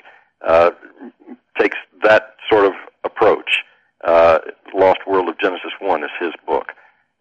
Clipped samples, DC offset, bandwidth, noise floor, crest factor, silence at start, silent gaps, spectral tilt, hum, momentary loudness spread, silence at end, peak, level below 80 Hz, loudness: under 0.1%; under 0.1%; 9 kHz; -44 dBFS; 14 dB; 0.45 s; none; -5.5 dB/octave; none; 11 LU; 0.5 s; -2 dBFS; -54 dBFS; -17 LUFS